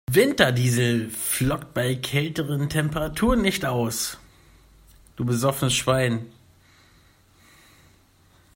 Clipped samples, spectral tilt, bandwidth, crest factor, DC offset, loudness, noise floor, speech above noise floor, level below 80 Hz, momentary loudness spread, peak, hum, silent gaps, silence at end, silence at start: under 0.1%; -4.5 dB/octave; 16.5 kHz; 22 dB; under 0.1%; -23 LUFS; -57 dBFS; 35 dB; -44 dBFS; 8 LU; -2 dBFS; none; none; 2.25 s; 0.1 s